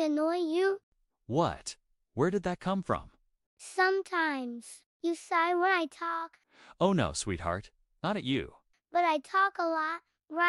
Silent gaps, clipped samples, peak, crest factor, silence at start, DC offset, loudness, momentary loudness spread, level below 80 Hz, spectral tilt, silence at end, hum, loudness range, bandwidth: 0.83-0.92 s, 3.46-3.57 s, 4.86-5.00 s; under 0.1%; -14 dBFS; 18 dB; 0 s; under 0.1%; -31 LUFS; 14 LU; -58 dBFS; -5 dB/octave; 0 s; none; 2 LU; 12 kHz